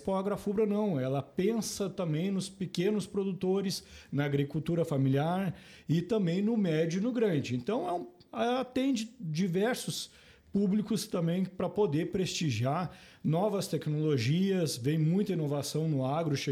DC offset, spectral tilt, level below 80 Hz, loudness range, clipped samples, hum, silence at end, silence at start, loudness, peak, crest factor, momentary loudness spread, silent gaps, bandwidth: under 0.1%; -6 dB/octave; -64 dBFS; 2 LU; under 0.1%; none; 0 s; 0 s; -31 LUFS; -16 dBFS; 14 dB; 7 LU; none; 15.5 kHz